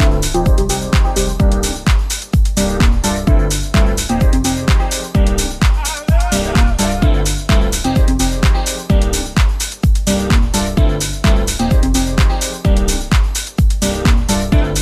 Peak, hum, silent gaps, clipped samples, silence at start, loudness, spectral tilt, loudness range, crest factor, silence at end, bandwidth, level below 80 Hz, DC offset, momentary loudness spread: -2 dBFS; none; none; under 0.1%; 0 s; -15 LUFS; -5 dB/octave; 0 LU; 12 dB; 0 s; 15 kHz; -14 dBFS; under 0.1%; 2 LU